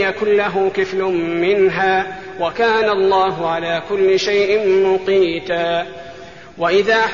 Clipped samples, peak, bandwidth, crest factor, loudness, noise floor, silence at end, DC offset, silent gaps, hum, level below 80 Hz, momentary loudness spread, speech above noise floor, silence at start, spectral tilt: under 0.1%; -4 dBFS; 7.2 kHz; 14 dB; -16 LUFS; -36 dBFS; 0 s; 0.5%; none; none; -52 dBFS; 8 LU; 20 dB; 0 s; -2.5 dB/octave